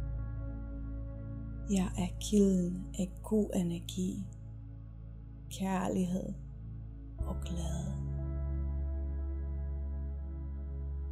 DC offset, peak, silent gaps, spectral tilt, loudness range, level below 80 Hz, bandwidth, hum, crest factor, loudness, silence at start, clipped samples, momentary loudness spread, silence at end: under 0.1%; -16 dBFS; none; -7 dB/octave; 6 LU; -40 dBFS; 15 kHz; none; 20 dB; -36 LUFS; 0 s; under 0.1%; 15 LU; 0 s